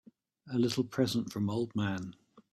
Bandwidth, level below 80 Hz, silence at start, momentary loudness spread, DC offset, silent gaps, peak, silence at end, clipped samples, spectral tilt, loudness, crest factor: 14.5 kHz; -68 dBFS; 0.45 s; 7 LU; under 0.1%; none; -16 dBFS; 0.15 s; under 0.1%; -6 dB/octave; -33 LUFS; 18 dB